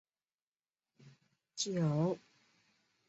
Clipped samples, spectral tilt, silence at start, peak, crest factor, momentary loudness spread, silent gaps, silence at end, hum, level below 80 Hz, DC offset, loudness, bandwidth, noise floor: under 0.1%; -6.5 dB/octave; 1.05 s; -22 dBFS; 18 dB; 13 LU; none; 0.9 s; none; -80 dBFS; under 0.1%; -36 LUFS; 8 kHz; under -90 dBFS